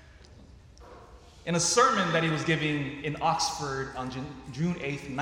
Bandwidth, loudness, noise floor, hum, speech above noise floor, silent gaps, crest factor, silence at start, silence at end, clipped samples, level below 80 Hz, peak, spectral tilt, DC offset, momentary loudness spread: 16 kHz; -28 LUFS; -51 dBFS; none; 23 dB; none; 20 dB; 0.05 s; 0 s; under 0.1%; -54 dBFS; -10 dBFS; -4 dB/octave; under 0.1%; 14 LU